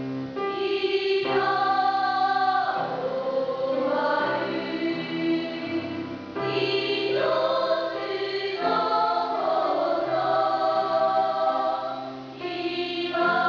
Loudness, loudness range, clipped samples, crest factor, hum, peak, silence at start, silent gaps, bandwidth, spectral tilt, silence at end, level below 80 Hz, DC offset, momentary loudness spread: -25 LUFS; 3 LU; under 0.1%; 14 dB; none; -12 dBFS; 0 s; none; 5.4 kHz; -6 dB/octave; 0 s; -66 dBFS; under 0.1%; 7 LU